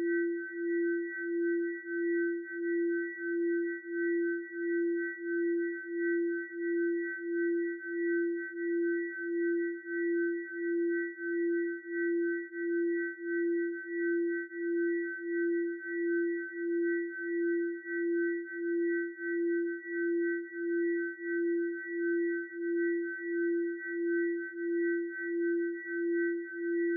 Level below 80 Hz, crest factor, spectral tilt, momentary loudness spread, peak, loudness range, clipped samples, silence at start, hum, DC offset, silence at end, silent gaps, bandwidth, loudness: under -90 dBFS; 10 dB; 1 dB/octave; 4 LU; -24 dBFS; 1 LU; under 0.1%; 0 s; none; under 0.1%; 0 s; none; 2.1 kHz; -33 LUFS